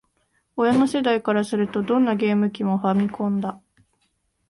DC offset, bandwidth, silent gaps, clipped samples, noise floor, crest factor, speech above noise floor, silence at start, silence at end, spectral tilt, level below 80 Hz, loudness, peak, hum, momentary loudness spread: under 0.1%; 11.5 kHz; none; under 0.1%; -70 dBFS; 16 dB; 49 dB; 0.55 s; 0.95 s; -7 dB/octave; -62 dBFS; -22 LUFS; -6 dBFS; none; 5 LU